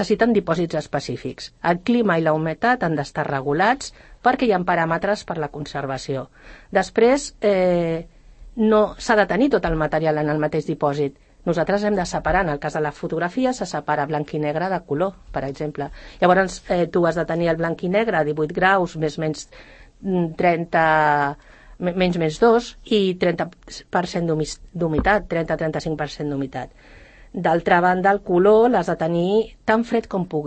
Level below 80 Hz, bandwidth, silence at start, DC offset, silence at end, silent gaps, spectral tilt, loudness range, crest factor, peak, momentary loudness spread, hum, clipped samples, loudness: -44 dBFS; 8.8 kHz; 0 s; under 0.1%; 0 s; none; -6 dB/octave; 4 LU; 18 dB; -4 dBFS; 11 LU; none; under 0.1%; -21 LUFS